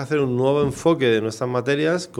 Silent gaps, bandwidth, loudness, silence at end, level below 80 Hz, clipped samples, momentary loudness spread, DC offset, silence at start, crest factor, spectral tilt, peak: none; 14 kHz; -20 LUFS; 0 s; -52 dBFS; under 0.1%; 4 LU; under 0.1%; 0 s; 16 dB; -6 dB/octave; -6 dBFS